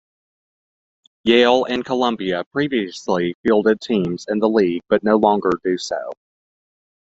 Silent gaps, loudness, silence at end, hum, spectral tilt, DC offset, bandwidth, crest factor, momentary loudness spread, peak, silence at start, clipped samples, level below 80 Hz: 2.46-2.51 s, 3.35-3.44 s; -19 LUFS; 0.95 s; none; -5.5 dB/octave; under 0.1%; 8 kHz; 18 dB; 8 LU; -2 dBFS; 1.25 s; under 0.1%; -58 dBFS